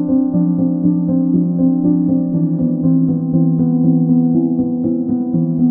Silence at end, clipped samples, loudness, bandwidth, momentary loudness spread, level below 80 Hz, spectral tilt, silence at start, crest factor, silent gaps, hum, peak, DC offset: 0 s; under 0.1%; -15 LUFS; 1.6 kHz; 4 LU; -50 dBFS; -17 dB/octave; 0 s; 12 dB; none; none; -2 dBFS; under 0.1%